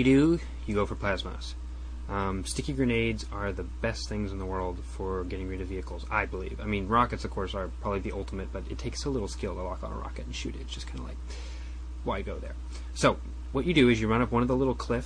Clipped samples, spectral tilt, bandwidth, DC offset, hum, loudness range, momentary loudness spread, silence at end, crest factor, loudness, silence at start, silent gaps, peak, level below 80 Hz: under 0.1%; -6 dB/octave; 10.5 kHz; under 0.1%; none; 8 LU; 13 LU; 0 s; 20 dB; -31 LUFS; 0 s; none; -10 dBFS; -38 dBFS